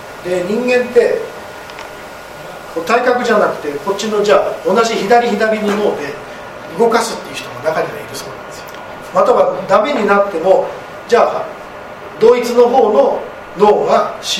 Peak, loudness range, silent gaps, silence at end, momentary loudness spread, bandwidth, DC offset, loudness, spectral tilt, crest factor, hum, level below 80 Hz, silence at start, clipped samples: 0 dBFS; 4 LU; none; 0 s; 18 LU; 16 kHz; under 0.1%; -13 LUFS; -4 dB/octave; 14 dB; none; -50 dBFS; 0 s; under 0.1%